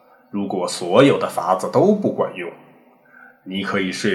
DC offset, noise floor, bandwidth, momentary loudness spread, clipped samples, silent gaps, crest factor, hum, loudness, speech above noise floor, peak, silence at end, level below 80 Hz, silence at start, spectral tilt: under 0.1%; -51 dBFS; 13.5 kHz; 15 LU; under 0.1%; none; 20 dB; none; -19 LUFS; 32 dB; 0 dBFS; 0 s; -68 dBFS; 0.35 s; -5.5 dB/octave